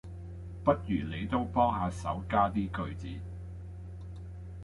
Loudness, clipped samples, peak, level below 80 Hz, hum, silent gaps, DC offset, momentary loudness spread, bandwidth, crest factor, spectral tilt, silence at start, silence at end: -32 LUFS; under 0.1%; -12 dBFS; -46 dBFS; none; none; under 0.1%; 16 LU; 11.5 kHz; 20 dB; -7.5 dB/octave; 0.05 s; 0 s